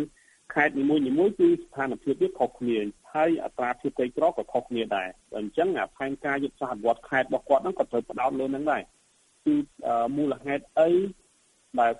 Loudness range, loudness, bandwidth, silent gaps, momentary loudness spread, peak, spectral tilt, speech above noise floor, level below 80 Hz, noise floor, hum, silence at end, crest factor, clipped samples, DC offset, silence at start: 3 LU; -27 LUFS; 11.5 kHz; none; 8 LU; -8 dBFS; -6.5 dB/octave; 38 dB; -62 dBFS; -64 dBFS; none; 0 s; 18 dB; under 0.1%; under 0.1%; 0 s